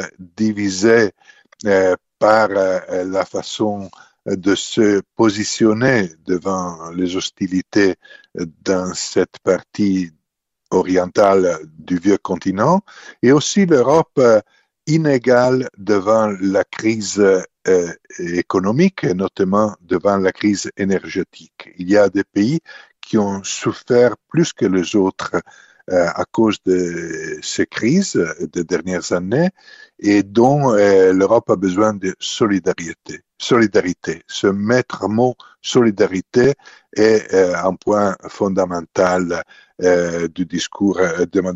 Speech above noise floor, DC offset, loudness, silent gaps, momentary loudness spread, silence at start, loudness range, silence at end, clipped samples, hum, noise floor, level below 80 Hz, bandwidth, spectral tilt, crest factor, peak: 57 dB; under 0.1%; -17 LUFS; none; 10 LU; 0 s; 4 LU; 0 s; under 0.1%; none; -74 dBFS; -56 dBFS; 8.2 kHz; -5.5 dB/octave; 16 dB; 0 dBFS